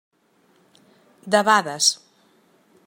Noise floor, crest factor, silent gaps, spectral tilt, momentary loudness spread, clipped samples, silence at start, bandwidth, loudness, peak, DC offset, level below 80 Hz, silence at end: -61 dBFS; 22 dB; none; -1.5 dB/octave; 6 LU; under 0.1%; 1.25 s; 16.5 kHz; -19 LUFS; -2 dBFS; under 0.1%; -76 dBFS; 0.9 s